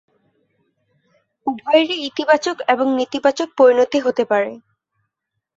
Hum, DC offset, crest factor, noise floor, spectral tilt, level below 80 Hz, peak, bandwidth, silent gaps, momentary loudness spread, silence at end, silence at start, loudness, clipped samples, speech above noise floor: none; under 0.1%; 18 dB; -78 dBFS; -3.5 dB/octave; -66 dBFS; -2 dBFS; 7.8 kHz; none; 11 LU; 1 s; 1.45 s; -17 LUFS; under 0.1%; 61 dB